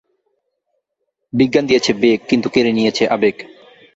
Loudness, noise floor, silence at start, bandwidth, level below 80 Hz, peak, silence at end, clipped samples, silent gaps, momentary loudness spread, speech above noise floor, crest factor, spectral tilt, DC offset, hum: -15 LUFS; -74 dBFS; 1.35 s; 8 kHz; -54 dBFS; -2 dBFS; 0.5 s; under 0.1%; none; 5 LU; 59 dB; 16 dB; -5 dB/octave; under 0.1%; none